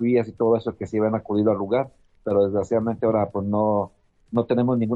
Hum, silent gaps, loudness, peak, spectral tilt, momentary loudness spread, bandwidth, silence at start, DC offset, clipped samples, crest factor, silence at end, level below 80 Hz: none; none; -23 LUFS; -8 dBFS; -9 dB/octave; 6 LU; 7.8 kHz; 0 s; under 0.1%; under 0.1%; 16 dB; 0 s; -58 dBFS